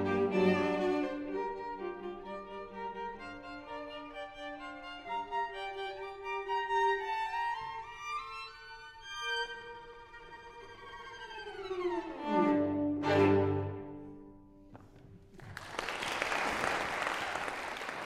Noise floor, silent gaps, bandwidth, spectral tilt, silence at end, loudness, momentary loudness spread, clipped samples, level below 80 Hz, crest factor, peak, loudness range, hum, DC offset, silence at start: -56 dBFS; none; 14 kHz; -5.5 dB/octave; 0 s; -35 LUFS; 19 LU; under 0.1%; -62 dBFS; 20 dB; -16 dBFS; 10 LU; none; under 0.1%; 0 s